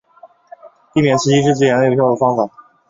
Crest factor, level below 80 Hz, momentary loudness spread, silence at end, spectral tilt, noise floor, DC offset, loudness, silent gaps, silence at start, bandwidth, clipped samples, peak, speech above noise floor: 14 dB; -54 dBFS; 7 LU; 0.4 s; -6 dB/octave; -46 dBFS; under 0.1%; -15 LUFS; none; 0.25 s; 7.8 kHz; under 0.1%; -2 dBFS; 32 dB